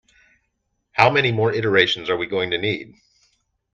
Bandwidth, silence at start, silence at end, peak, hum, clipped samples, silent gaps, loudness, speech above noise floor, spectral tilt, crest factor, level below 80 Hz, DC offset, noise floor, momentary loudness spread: 7.4 kHz; 0.95 s; 0.9 s; 0 dBFS; none; under 0.1%; none; -19 LUFS; 53 dB; -5.5 dB/octave; 22 dB; -60 dBFS; under 0.1%; -73 dBFS; 9 LU